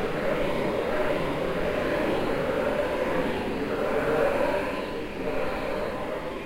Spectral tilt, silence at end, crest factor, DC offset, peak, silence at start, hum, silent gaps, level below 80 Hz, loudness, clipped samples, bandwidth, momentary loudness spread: -6 dB/octave; 0 s; 16 dB; under 0.1%; -12 dBFS; 0 s; none; none; -42 dBFS; -27 LUFS; under 0.1%; 16 kHz; 6 LU